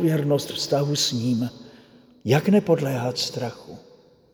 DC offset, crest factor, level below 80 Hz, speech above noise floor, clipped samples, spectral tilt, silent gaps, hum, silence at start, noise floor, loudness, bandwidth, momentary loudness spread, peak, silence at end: under 0.1%; 18 dB; -64 dBFS; 29 dB; under 0.1%; -5.5 dB/octave; none; none; 0 s; -51 dBFS; -23 LUFS; over 20 kHz; 14 LU; -6 dBFS; 0.55 s